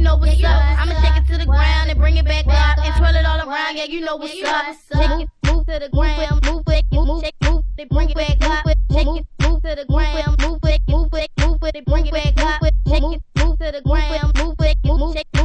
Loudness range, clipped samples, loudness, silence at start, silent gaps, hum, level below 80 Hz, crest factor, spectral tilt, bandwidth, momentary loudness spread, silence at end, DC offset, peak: 3 LU; under 0.1%; -18 LUFS; 0 s; none; none; -16 dBFS; 12 dB; -6 dB/octave; 9.6 kHz; 6 LU; 0 s; under 0.1%; -4 dBFS